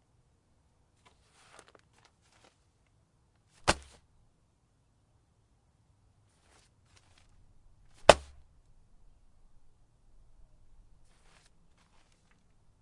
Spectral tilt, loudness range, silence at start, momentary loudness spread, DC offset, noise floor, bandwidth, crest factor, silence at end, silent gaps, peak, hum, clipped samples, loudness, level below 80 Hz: -3 dB/octave; 8 LU; 3.65 s; 10 LU; under 0.1%; -71 dBFS; 11.5 kHz; 38 dB; 4.65 s; none; 0 dBFS; none; under 0.1%; -27 LUFS; -56 dBFS